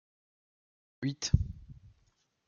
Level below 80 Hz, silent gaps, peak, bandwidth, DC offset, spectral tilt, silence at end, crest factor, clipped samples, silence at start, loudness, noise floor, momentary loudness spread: -46 dBFS; none; -12 dBFS; 7.2 kHz; under 0.1%; -5 dB/octave; 0.75 s; 26 dB; under 0.1%; 1 s; -34 LUFS; -73 dBFS; 20 LU